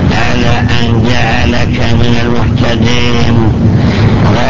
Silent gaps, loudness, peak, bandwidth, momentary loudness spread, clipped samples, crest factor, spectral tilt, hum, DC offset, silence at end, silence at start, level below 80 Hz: none; -10 LUFS; 0 dBFS; 7.4 kHz; 2 LU; 0.3%; 10 dB; -6.5 dB/octave; none; 20%; 0 s; 0 s; -18 dBFS